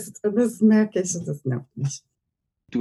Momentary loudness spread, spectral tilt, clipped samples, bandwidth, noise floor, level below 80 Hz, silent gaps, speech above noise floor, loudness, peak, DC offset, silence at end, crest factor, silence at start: 12 LU; -6.5 dB/octave; under 0.1%; 12.5 kHz; -81 dBFS; -68 dBFS; none; 58 dB; -23 LUFS; -8 dBFS; under 0.1%; 0 s; 16 dB; 0 s